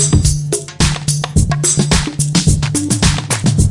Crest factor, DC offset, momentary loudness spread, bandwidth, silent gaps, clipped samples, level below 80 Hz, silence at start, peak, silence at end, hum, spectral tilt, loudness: 14 dB; under 0.1%; 3 LU; 11.5 kHz; none; under 0.1%; -24 dBFS; 0 s; 0 dBFS; 0 s; none; -4 dB/octave; -14 LUFS